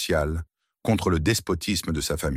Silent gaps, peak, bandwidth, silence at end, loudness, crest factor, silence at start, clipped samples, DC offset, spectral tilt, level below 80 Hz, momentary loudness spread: none; -8 dBFS; 16.5 kHz; 0 s; -25 LUFS; 18 dB; 0 s; under 0.1%; under 0.1%; -4.5 dB/octave; -36 dBFS; 10 LU